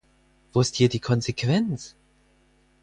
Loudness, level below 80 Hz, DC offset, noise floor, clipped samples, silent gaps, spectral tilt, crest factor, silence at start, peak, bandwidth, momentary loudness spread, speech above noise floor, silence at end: -24 LUFS; -56 dBFS; under 0.1%; -62 dBFS; under 0.1%; none; -5.5 dB/octave; 20 dB; 0.55 s; -6 dBFS; 10 kHz; 10 LU; 39 dB; 0.95 s